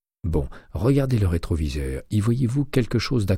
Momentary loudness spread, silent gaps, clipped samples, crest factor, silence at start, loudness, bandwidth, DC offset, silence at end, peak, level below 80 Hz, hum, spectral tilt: 7 LU; none; under 0.1%; 16 dB; 0.25 s; -24 LUFS; 16 kHz; under 0.1%; 0 s; -6 dBFS; -34 dBFS; none; -7.5 dB/octave